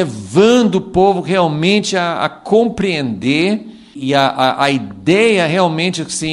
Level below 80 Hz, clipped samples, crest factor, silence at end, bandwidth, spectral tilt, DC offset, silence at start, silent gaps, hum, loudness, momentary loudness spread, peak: -48 dBFS; under 0.1%; 14 dB; 0 s; 11.5 kHz; -5 dB/octave; under 0.1%; 0 s; none; none; -14 LUFS; 7 LU; 0 dBFS